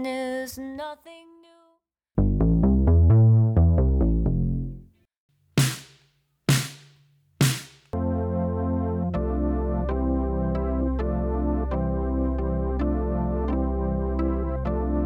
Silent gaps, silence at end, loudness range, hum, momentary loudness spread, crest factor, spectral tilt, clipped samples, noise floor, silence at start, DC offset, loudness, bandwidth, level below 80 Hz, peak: 5.20-5.29 s; 0 s; 6 LU; none; 13 LU; 14 dB; -7 dB/octave; under 0.1%; -68 dBFS; 0 s; under 0.1%; -24 LUFS; 19.5 kHz; -28 dBFS; -8 dBFS